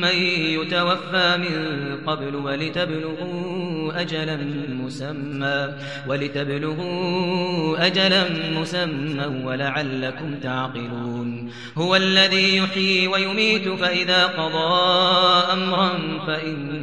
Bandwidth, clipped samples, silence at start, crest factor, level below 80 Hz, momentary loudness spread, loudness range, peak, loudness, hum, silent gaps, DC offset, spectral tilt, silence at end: 11 kHz; under 0.1%; 0 s; 20 dB; -68 dBFS; 12 LU; 8 LU; -2 dBFS; -21 LUFS; none; none; 0.4%; -5 dB/octave; 0 s